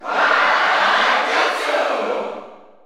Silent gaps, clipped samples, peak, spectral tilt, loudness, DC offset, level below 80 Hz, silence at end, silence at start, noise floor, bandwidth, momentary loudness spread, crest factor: none; under 0.1%; -2 dBFS; -1 dB/octave; -16 LUFS; under 0.1%; -72 dBFS; 0.25 s; 0 s; -38 dBFS; 16 kHz; 10 LU; 16 dB